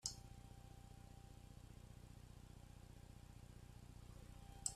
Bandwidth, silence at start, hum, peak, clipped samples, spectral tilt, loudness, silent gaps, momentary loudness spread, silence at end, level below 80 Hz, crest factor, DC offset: 14.5 kHz; 0 s; 60 Hz at -70 dBFS; -26 dBFS; under 0.1%; -3 dB/octave; -59 LUFS; none; 3 LU; 0 s; -64 dBFS; 30 dB; under 0.1%